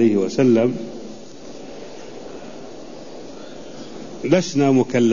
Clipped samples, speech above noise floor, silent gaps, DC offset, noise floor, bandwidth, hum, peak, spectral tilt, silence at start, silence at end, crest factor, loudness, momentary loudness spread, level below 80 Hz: under 0.1%; 21 dB; none; 1%; -38 dBFS; 7.4 kHz; none; -4 dBFS; -6.5 dB/octave; 0 s; 0 s; 16 dB; -18 LUFS; 21 LU; -56 dBFS